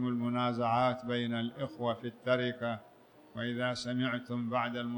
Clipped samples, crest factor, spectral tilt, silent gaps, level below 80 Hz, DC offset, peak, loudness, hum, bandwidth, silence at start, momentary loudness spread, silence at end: under 0.1%; 18 dB; -6.5 dB/octave; none; -74 dBFS; under 0.1%; -16 dBFS; -34 LUFS; none; 19.5 kHz; 0 s; 8 LU; 0 s